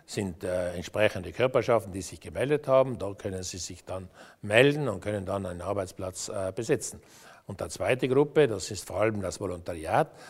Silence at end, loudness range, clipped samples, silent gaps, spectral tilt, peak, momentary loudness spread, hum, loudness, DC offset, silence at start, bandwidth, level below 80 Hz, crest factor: 0 s; 3 LU; under 0.1%; none; -5 dB/octave; -4 dBFS; 14 LU; none; -29 LUFS; under 0.1%; 0.1 s; 16 kHz; -58 dBFS; 24 dB